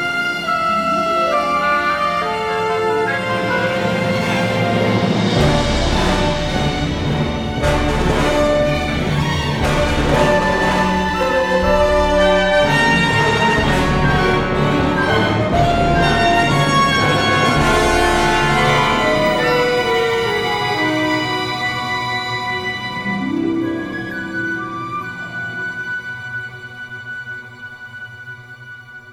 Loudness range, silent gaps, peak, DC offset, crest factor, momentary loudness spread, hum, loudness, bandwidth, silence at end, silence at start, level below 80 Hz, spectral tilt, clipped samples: 9 LU; none; -2 dBFS; under 0.1%; 16 dB; 12 LU; none; -16 LUFS; 17 kHz; 0 s; 0 s; -30 dBFS; -5 dB/octave; under 0.1%